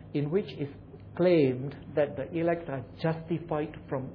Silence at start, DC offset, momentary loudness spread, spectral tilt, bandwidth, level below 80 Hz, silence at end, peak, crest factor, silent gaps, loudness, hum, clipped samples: 0 s; under 0.1%; 14 LU; -10.5 dB/octave; 5.4 kHz; -58 dBFS; 0 s; -12 dBFS; 18 dB; none; -30 LUFS; none; under 0.1%